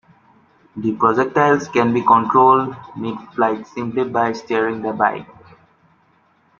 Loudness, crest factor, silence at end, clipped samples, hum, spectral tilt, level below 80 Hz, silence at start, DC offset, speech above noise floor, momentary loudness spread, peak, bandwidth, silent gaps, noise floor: -18 LUFS; 18 dB; 1.35 s; under 0.1%; none; -6.5 dB/octave; -62 dBFS; 0.75 s; under 0.1%; 41 dB; 14 LU; -2 dBFS; 7.2 kHz; none; -58 dBFS